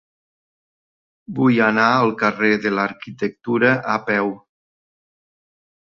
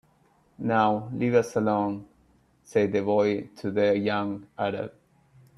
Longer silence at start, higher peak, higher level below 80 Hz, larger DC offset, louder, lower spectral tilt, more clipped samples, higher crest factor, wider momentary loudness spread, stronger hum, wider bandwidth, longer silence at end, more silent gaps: first, 1.3 s vs 0.6 s; first, -2 dBFS vs -8 dBFS; about the same, -64 dBFS vs -66 dBFS; neither; first, -18 LUFS vs -26 LUFS; about the same, -7 dB/octave vs -7 dB/octave; neither; about the same, 20 dB vs 18 dB; about the same, 11 LU vs 10 LU; neither; second, 6.8 kHz vs 12 kHz; first, 1.5 s vs 0.7 s; neither